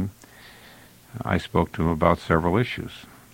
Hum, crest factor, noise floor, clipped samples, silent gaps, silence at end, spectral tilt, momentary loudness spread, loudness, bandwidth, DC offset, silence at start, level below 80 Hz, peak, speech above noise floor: none; 24 dB; -49 dBFS; under 0.1%; none; 0.3 s; -7 dB/octave; 16 LU; -24 LUFS; 17 kHz; under 0.1%; 0 s; -42 dBFS; -2 dBFS; 26 dB